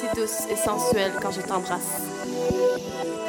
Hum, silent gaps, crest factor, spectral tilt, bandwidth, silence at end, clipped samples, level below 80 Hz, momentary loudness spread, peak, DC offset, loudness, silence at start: none; none; 16 dB; -3.5 dB/octave; 18 kHz; 0 s; under 0.1%; -52 dBFS; 6 LU; -10 dBFS; under 0.1%; -26 LUFS; 0 s